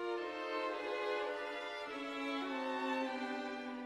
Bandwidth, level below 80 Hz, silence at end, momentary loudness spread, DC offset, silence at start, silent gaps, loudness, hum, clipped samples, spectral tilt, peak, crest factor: 13 kHz; -78 dBFS; 0 s; 5 LU; under 0.1%; 0 s; none; -40 LUFS; none; under 0.1%; -3 dB/octave; -26 dBFS; 14 dB